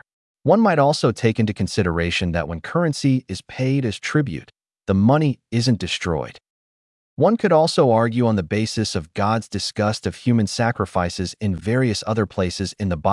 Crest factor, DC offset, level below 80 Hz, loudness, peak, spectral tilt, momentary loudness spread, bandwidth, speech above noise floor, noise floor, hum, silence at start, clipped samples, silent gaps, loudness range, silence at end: 16 dB; under 0.1%; -50 dBFS; -20 LUFS; -4 dBFS; -6 dB/octave; 9 LU; 12 kHz; over 70 dB; under -90 dBFS; none; 0.45 s; under 0.1%; 6.50-7.17 s; 3 LU; 0 s